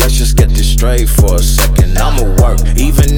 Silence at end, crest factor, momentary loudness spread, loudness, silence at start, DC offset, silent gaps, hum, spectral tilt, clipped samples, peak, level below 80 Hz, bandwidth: 0 s; 8 dB; 2 LU; -11 LUFS; 0 s; under 0.1%; none; none; -5 dB/octave; under 0.1%; 0 dBFS; -10 dBFS; 19.5 kHz